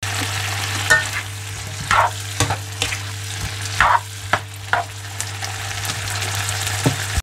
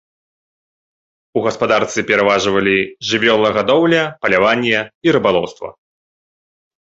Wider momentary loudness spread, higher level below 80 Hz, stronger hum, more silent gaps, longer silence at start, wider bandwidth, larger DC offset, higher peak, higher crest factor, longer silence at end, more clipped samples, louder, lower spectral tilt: first, 11 LU vs 7 LU; first, -42 dBFS vs -52 dBFS; neither; second, none vs 4.94-5.01 s; second, 0 s vs 1.35 s; first, 16 kHz vs 8 kHz; neither; about the same, 0 dBFS vs 0 dBFS; first, 22 dB vs 16 dB; second, 0 s vs 1.1 s; neither; second, -21 LUFS vs -15 LUFS; second, -2.5 dB/octave vs -4.5 dB/octave